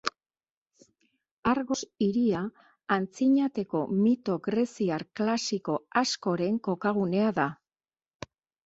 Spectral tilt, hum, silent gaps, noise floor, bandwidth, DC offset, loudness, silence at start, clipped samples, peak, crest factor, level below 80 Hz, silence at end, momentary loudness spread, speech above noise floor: -5.5 dB/octave; none; 0.50-0.66 s, 1.31-1.43 s; under -90 dBFS; 8 kHz; under 0.1%; -28 LUFS; 0.05 s; under 0.1%; -8 dBFS; 20 dB; -64 dBFS; 1.1 s; 8 LU; over 63 dB